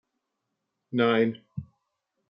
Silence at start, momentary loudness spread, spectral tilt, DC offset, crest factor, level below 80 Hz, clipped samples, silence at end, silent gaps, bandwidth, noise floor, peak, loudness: 0.9 s; 19 LU; -9 dB/octave; under 0.1%; 20 dB; -70 dBFS; under 0.1%; 0.65 s; none; 5.4 kHz; -82 dBFS; -10 dBFS; -25 LUFS